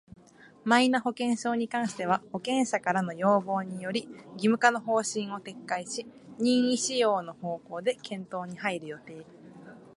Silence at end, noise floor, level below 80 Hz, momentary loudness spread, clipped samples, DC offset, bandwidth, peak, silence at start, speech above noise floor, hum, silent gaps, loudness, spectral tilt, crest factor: 0.15 s; -55 dBFS; -74 dBFS; 14 LU; under 0.1%; under 0.1%; 11.5 kHz; -6 dBFS; 0.45 s; 27 dB; none; none; -29 LUFS; -4 dB/octave; 22 dB